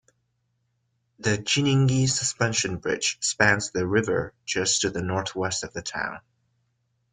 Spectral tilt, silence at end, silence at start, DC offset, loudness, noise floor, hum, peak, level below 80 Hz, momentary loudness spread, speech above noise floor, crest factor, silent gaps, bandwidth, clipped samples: -3.5 dB/octave; 0.95 s; 1.2 s; under 0.1%; -24 LUFS; -73 dBFS; none; -4 dBFS; -56 dBFS; 9 LU; 49 dB; 22 dB; none; 9.6 kHz; under 0.1%